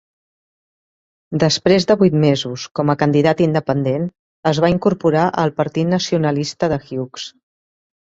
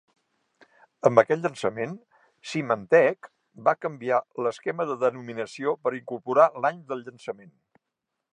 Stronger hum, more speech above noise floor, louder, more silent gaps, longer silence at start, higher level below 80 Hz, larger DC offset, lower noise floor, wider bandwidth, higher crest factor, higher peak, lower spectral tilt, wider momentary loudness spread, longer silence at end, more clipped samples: neither; first, over 74 dB vs 59 dB; first, -17 LUFS vs -25 LUFS; first, 2.71-2.75 s, 4.19-4.43 s vs none; first, 1.3 s vs 1.05 s; first, -52 dBFS vs -76 dBFS; neither; first, under -90 dBFS vs -84 dBFS; second, 7.8 kHz vs 10.5 kHz; second, 16 dB vs 24 dB; about the same, 0 dBFS vs -2 dBFS; about the same, -6 dB/octave vs -6 dB/octave; second, 12 LU vs 17 LU; second, 0.8 s vs 1 s; neither